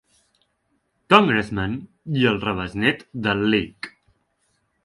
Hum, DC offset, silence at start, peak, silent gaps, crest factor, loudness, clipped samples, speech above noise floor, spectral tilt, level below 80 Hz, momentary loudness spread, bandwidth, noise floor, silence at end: none; under 0.1%; 1.1 s; 0 dBFS; none; 22 dB; -21 LUFS; under 0.1%; 50 dB; -6.5 dB/octave; -50 dBFS; 17 LU; 11.5 kHz; -70 dBFS; 0.95 s